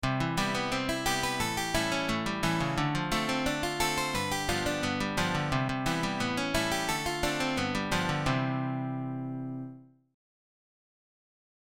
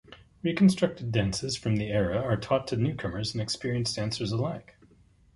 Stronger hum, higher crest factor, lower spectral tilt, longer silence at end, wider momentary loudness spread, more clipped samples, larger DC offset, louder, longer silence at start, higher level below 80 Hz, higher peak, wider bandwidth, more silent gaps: neither; about the same, 20 dB vs 18 dB; second, -4 dB/octave vs -6 dB/octave; first, 1.8 s vs 0.75 s; second, 5 LU vs 9 LU; neither; first, 0.1% vs under 0.1%; about the same, -30 LUFS vs -28 LUFS; about the same, 0 s vs 0.1 s; about the same, -46 dBFS vs -50 dBFS; about the same, -12 dBFS vs -10 dBFS; first, 17 kHz vs 11.5 kHz; neither